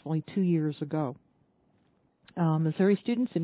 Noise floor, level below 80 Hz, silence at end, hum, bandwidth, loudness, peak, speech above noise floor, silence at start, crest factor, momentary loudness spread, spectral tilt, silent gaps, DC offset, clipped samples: -69 dBFS; -74 dBFS; 0 s; none; 4 kHz; -29 LUFS; -14 dBFS; 41 dB; 0.05 s; 16 dB; 7 LU; -8.5 dB/octave; none; under 0.1%; under 0.1%